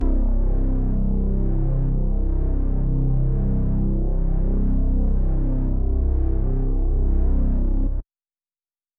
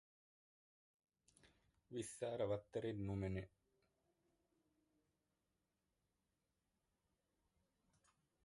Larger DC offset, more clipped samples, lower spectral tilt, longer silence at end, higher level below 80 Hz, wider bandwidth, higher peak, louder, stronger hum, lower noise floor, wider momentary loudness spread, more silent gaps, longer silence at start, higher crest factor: neither; neither; first, -13.5 dB/octave vs -6.5 dB/octave; second, 0.95 s vs 5 s; first, -20 dBFS vs -70 dBFS; second, 1.7 kHz vs 11 kHz; first, -10 dBFS vs -32 dBFS; first, -24 LUFS vs -47 LUFS; neither; about the same, under -90 dBFS vs -89 dBFS; second, 2 LU vs 7 LU; neither; second, 0 s vs 1.45 s; second, 10 dB vs 22 dB